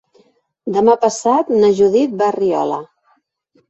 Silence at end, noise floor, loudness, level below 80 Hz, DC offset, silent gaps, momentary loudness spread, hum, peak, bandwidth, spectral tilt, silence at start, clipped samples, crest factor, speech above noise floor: 0.85 s; -60 dBFS; -15 LUFS; -60 dBFS; under 0.1%; none; 9 LU; none; -2 dBFS; 8.2 kHz; -5.5 dB/octave; 0.65 s; under 0.1%; 14 dB; 46 dB